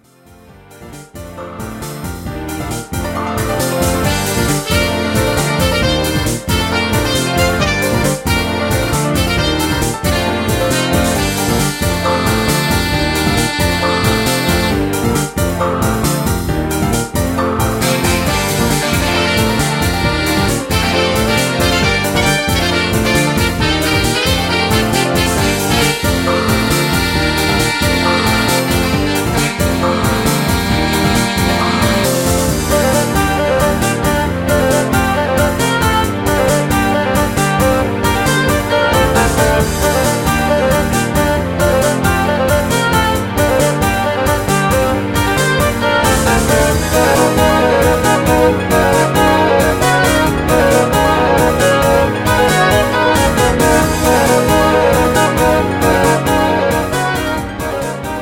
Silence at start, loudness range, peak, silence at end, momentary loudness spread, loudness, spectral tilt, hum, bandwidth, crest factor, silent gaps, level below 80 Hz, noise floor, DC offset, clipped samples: 0.7 s; 3 LU; 0 dBFS; 0 s; 4 LU; -13 LUFS; -4.5 dB/octave; none; 17 kHz; 14 dB; none; -26 dBFS; -43 dBFS; under 0.1%; under 0.1%